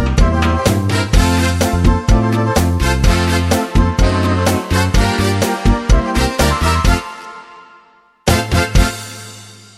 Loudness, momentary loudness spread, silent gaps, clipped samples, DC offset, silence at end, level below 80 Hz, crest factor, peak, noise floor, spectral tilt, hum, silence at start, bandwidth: -15 LUFS; 8 LU; none; under 0.1%; under 0.1%; 0.25 s; -18 dBFS; 14 dB; 0 dBFS; -48 dBFS; -5 dB/octave; none; 0 s; 16 kHz